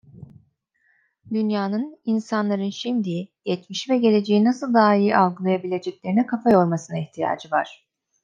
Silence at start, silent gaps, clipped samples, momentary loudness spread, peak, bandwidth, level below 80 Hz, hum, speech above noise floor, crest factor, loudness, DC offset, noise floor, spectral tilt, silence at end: 0.15 s; none; under 0.1%; 11 LU; -4 dBFS; 7.6 kHz; -68 dBFS; none; 45 dB; 18 dB; -22 LUFS; under 0.1%; -66 dBFS; -6.5 dB/octave; 0.5 s